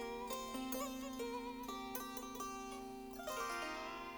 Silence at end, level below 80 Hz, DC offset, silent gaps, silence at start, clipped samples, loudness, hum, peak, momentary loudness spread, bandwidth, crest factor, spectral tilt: 0 s; -64 dBFS; under 0.1%; none; 0 s; under 0.1%; -45 LUFS; none; -28 dBFS; 6 LU; over 20 kHz; 18 dB; -2.5 dB/octave